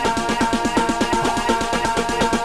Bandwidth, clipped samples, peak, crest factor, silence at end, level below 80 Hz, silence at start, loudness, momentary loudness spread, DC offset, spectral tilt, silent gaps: 15.5 kHz; under 0.1%; -4 dBFS; 16 dB; 0 s; -36 dBFS; 0 s; -20 LUFS; 1 LU; under 0.1%; -3.5 dB/octave; none